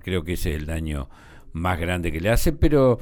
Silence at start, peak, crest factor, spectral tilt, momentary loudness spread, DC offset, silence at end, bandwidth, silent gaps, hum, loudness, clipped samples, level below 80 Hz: 0.05 s; -6 dBFS; 16 dB; -6 dB/octave; 13 LU; under 0.1%; 0 s; over 20 kHz; none; none; -24 LUFS; under 0.1%; -28 dBFS